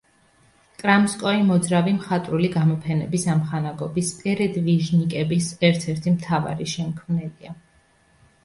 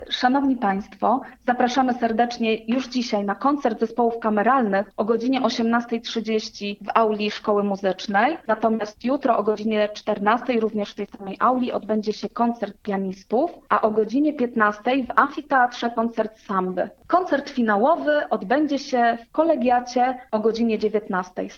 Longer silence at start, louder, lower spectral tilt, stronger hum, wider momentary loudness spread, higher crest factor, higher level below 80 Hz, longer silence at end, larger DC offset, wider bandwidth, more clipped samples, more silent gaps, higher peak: first, 0.8 s vs 0 s; about the same, -22 LUFS vs -22 LUFS; about the same, -6 dB/octave vs -5.5 dB/octave; neither; about the same, 8 LU vs 6 LU; about the same, 18 dB vs 22 dB; about the same, -56 dBFS vs -60 dBFS; first, 0.9 s vs 0 s; neither; first, 11.5 kHz vs 7.2 kHz; neither; neither; second, -4 dBFS vs 0 dBFS